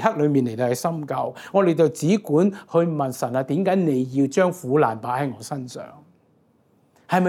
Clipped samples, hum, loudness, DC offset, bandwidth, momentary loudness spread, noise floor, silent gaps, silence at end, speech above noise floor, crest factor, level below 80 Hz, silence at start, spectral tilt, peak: under 0.1%; none; -22 LUFS; under 0.1%; 16.5 kHz; 9 LU; -61 dBFS; none; 0 s; 39 dB; 20 dB; -74 dBFS; 0 s; -7 dB/octave; -2 dBFS